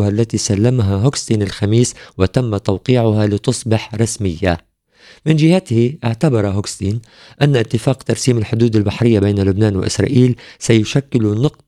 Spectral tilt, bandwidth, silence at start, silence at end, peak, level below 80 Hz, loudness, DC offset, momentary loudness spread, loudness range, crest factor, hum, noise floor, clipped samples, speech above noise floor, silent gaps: -6 dB/octave; 12 kHz; 0 s; 0.2 s; 0 dBFS; -44 dBFS; -16 LUFS; under 0.1%; 6 LU; 2 LU; 14 dB; none; -47 dBFS; under 0.1%; 32 dB; none